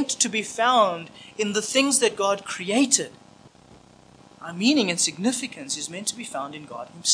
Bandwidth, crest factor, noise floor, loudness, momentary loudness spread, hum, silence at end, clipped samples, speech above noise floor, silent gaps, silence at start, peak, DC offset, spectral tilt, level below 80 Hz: 10.5 kHz; 20 dB; -51 dBFS; -23 LUFS; 16 LU; none; 0 s; under 0.1%; 27 dB; none; 0 s; -4 dBFS; under 0.1%; -2 dB/octave; -70 dBFS